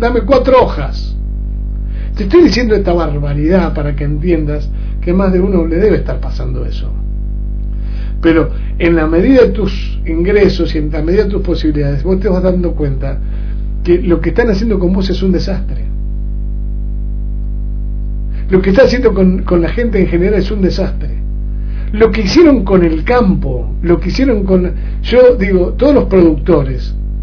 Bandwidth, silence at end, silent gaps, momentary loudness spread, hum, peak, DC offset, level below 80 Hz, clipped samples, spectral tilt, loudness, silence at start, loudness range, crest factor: 5.4 kHz; 0 s; none; 13 LU; 50 Hz at -15 dBFS; 0 dBFS; under 0.1%; -18 dBFS; 0.5%; -8 dB/octave; -13 LUFS; 0 s; 4 LU; 12 dB